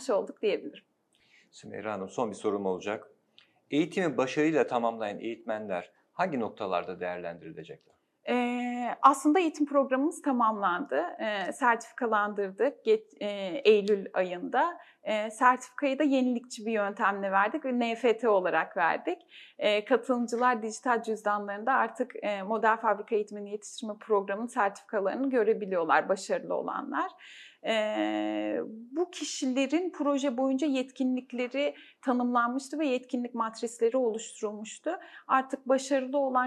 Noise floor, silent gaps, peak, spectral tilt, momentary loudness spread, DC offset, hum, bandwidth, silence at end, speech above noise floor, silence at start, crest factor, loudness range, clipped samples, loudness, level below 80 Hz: -65 dBFS; none; -6 dBFS; -4.5 dB/octave; 11 LU; under 0.1%; none; 12.5 kHz; 0 s; 36 dB; 0 s; 24 dB; 5 LU; under 0.1%; -29 LUFS; -88 dBFS